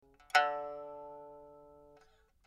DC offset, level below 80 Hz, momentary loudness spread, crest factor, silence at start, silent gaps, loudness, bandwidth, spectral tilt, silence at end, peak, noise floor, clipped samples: under 0.1%; -74 dBFS; 25 LU; 26 dB; 0.35 s; none; -33 LUFS; 14.5 kHz; -1 dB/octave; 0.75 s; -14 dBFS; -66 dBFS; under 0.1%